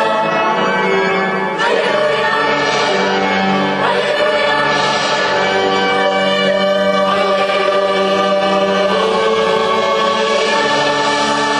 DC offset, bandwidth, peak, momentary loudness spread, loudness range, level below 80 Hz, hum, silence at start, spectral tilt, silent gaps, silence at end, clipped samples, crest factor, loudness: under 0.1%; 11.5 kHz; -2 dBFS; 1 LU; 1 LU; -54 dBFS; none; 0 s; -3.5 dB/octave; none; 0 s; under 0.1%; 12 dB; -14 LUFS